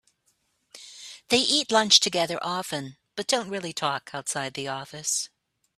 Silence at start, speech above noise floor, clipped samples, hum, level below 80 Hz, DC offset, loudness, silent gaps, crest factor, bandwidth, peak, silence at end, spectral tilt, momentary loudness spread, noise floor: 0.75 s; 45 dB; under 0.1%; none; -70 dBFS; under 0.1%; -24 LUFS; none; 26 dB; 15.5 kHz; -2 dBFS; 0.5 s; -1.5 dB/octave; 20 LU; -71 dBFS